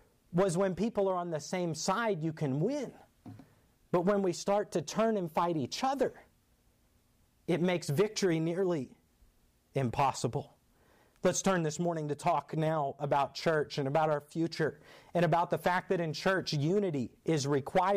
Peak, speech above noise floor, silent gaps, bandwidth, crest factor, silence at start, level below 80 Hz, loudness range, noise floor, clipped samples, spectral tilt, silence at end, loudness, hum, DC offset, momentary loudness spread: -20 dBFS; 38 dB; none; 15.5 kHz; 12 dB; 0.3 s; -66 dBFS; 3 LU; -69 dBFS; under 0.1%; -5.5 dB/octave; 0 s; -32 LUFS; none; under 0.1%; 6 LU